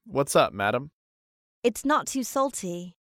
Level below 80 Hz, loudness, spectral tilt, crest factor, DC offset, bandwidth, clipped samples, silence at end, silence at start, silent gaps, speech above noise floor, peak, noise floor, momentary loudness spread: -62 dBFS; -26 LUFS; -4 dB/octave; 20 dB; under 0.1%; 16.5 kHz; under 0.1%; 0.25 s; 0.05 s; 0.93-1.62 s; over 64 dB; -8 dBFS; under -90 dBFS; 12 LU